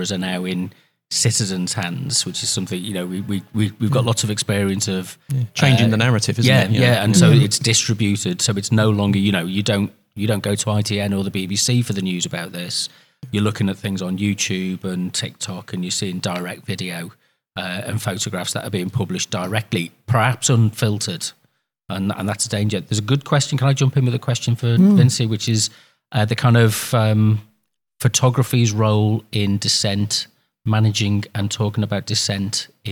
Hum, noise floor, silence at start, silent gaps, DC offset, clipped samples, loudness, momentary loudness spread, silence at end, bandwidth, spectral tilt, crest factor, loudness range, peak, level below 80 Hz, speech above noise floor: none; -68 dBFS; 0 s; none; under 0.1%; under 0.1%; -19 LUFS; 11 LU; 0 s; 19 kHz; -4.5 dB/octave; 18 dB; 8 LU; 0 dBFS; -58 dBFS; 49 dB